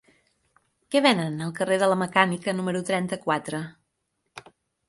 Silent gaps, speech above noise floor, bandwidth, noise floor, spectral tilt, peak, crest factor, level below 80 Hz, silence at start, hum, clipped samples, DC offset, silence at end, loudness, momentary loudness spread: none; 53 dB; 11.5 kHz; -77 dBFS; -5 dB/octave; -2 dBFS; 24 dB; -68 dBFS; 0.9 s; none; under 0.1%; under 0.1%; 0.5 s; -24 LUFS; 18 LU